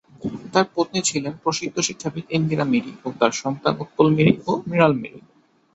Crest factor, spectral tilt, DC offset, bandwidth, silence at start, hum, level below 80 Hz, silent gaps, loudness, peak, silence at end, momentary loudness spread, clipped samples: 20 dB; -5 dB/octave; under 0.1%; 8.2 kHz; 0.2 s; none; -58 dBFS; none; -21 LUFS; -2 dBFS; 0.55 s; 10 LU; under 0.1%